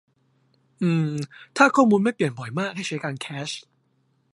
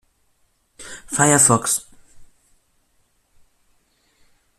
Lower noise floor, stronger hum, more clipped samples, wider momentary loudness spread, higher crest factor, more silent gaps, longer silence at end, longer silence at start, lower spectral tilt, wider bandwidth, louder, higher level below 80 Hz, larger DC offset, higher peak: about the same, -67 dBFS vs -64 dBFS; neither; neither; second, 15 LU vs 25 LU; about the same, 22 dB vs 22 dB; neither; second, 0.75 s vs 2.35 s; about the same, 0.8 s vs 0.8 s; first, -6 dB/octave vs -3.5 dB/octave; second, 11.5 kHz vs 15.5 kHz; second, -23 LUFS vs -16 LUFS; second, -70 dBFS vs -56 dBFS; neither; about the same, -2 dBFS vs -2 dBFS